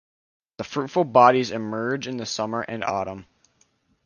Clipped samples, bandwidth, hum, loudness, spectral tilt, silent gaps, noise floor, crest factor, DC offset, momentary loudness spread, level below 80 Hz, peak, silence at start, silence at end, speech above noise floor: under 0.1%; 10 kHz; none; -23 LUFS; -5 dB/octave; none; -65 dBFS; 22 dB; under 0.1%; 15 LU; -62 dBFS; -2 dBFS; 0.6 s; 0.85 s; 43 dB